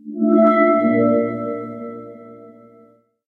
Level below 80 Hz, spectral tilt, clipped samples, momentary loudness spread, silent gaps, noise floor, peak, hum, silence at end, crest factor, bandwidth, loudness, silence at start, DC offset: -64 dBFS; -10 dB/octave; under 0.1%; 20 LU; none; -52 dBFS; -4 dBFS; none; 0.75 s; 16 dB; 4.3 kHz; -16 LUFS; 0.05 s; under 0.1%